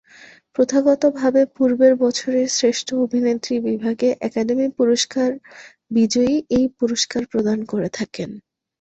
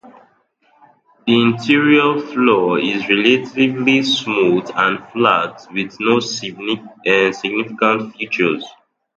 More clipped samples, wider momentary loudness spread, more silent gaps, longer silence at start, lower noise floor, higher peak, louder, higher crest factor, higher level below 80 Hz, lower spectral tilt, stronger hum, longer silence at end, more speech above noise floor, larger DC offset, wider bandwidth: neither; about the same, 8 LU vs 10 LU; neither; first, 0.6 s vs 0.05 s; second, -47 dBFS vs -58 dBFS; second, -4 dBFS vs 0 dBFS; second, -19 LUFS vs -16 LUFS; about the same, 16 dB vs 16 dB; first, -56 dBFS vs -62 dBFS; about the same, -4 dB/octave vs -5 dB/octave; neither; about the same, 0.4 s vs 0.5 s; second, 28 dB vs 42 dB; neither; about the same, 8.2 kHz vs 8 kHz